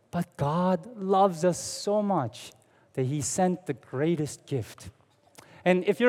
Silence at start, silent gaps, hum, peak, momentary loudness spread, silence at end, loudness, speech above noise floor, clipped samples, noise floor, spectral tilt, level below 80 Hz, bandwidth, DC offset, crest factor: 0.15 s; none; none; -8 dBFS; 13 LU; 0 s; -28 LUFS; 29 dB; under 0.1%; -56 dBFS; -5.5 dB/octave; -66 dBFS; 15.5 kHz; under 0.1%; 20 dB